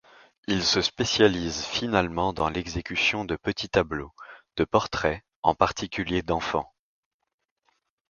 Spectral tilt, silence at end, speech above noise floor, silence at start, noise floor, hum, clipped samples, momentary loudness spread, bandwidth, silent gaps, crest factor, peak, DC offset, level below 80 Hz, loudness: -4 dB/octave; 1.45 s; 47 dB; 0.5 s; -73 dBFS; none; under 0.1%; 9 LU; 7.4 kHz; 5.36-5.43 s; 24 dB; -4 dBFS; under 0.1%; -48 dBFS; -26 LUFS